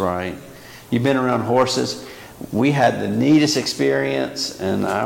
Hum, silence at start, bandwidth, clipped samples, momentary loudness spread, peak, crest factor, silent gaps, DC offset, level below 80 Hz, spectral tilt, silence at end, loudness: none; 0 s; 17 kHz; under 0.1%; 17 LU; -6 dBFS; 14 dB; none; under 0.1%; -54 dBFS; -5 dB/octave; 0 s; -19 LUFS